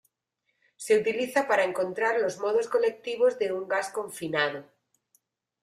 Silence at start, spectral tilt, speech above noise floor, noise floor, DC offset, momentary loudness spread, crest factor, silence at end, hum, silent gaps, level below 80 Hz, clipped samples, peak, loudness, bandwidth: 0.8 s; -3.5 dB/octave; 52 dB; -78 dBFS; under 0.1%; 6 LU; 20 dB; 1 s; none; none; -76 dBFS; under 0.1%; -8 dBFS; -27 LUFS; 15 kHz